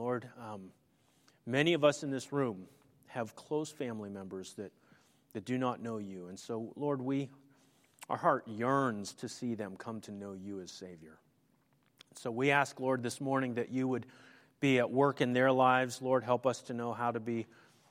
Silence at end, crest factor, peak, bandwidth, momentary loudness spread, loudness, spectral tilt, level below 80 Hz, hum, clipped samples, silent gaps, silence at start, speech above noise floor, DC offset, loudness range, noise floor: 0.45 s; 22 dB; -12 dBFS; 15.5 kHz; 18 LU; -34 LUFS; -5.5 dB/octave; -80 dBFS; none; under 0.1%; none; 0 s; 38 dB; under 0.1%; 10 LU; -72 dBFS